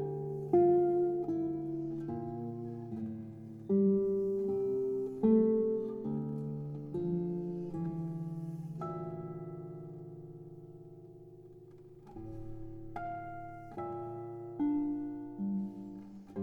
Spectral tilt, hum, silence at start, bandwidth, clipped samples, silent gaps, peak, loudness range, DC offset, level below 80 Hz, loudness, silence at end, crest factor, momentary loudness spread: -11.5 dB/octave; none; 0 s; 3.4 kHz; under 0.1%; none; -16 dBFS; 16 LU; under 0.1%; -62 dBFS; -35 LUFS; 0 s; 18 dB; 21 LU